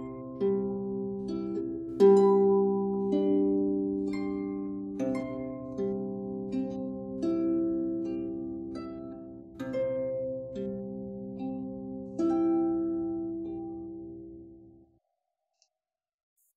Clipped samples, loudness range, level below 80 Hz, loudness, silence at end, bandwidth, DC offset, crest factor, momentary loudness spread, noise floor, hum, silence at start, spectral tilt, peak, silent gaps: under 0.1%; 10 LU; -62 dBFS; -30 LUFS; 1.85 s; 8 kHz; under 0.1%; 20 dB; 15 LU; under -90 dBFS; none; 0 s; -9 dB/octave; -10 dBFS; none